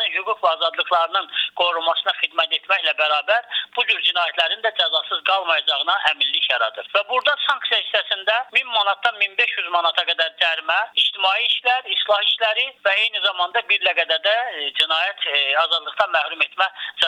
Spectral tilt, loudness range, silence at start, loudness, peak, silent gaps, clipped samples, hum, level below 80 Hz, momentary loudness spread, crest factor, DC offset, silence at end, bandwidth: 0 dB/octave; 1 LU; 0 s; -19 LUFS; -4 dBFS; none; under 0.1%; none; -74 dBFS; 3 LU; 18 dB; under 0.1%; 0 s; 11 kHz